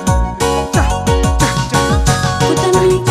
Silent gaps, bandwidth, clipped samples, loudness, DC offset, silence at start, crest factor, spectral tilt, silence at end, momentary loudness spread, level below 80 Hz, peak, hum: none; 15 kHz; under 0.1%; -13 LUFS; under 0.1%; 0 s; 12 dB; -5 dB/octave; 0 s; 4 LU; -20 dBFS; 0 dBFS; none